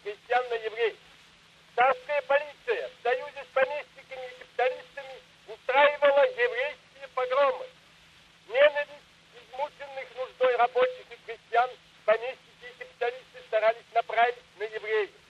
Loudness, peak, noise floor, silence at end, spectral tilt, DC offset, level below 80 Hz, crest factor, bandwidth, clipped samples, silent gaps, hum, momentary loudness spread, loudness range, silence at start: -28 LUFS; -8 dBFS; -57 dBFS; 0.2 s; -3 dB/octave; under 0.1%; -74 dBFS; 20 dB; 9.4 kHz; under 0.1%; none; none; 20 LU; 3 LU; 0.05 s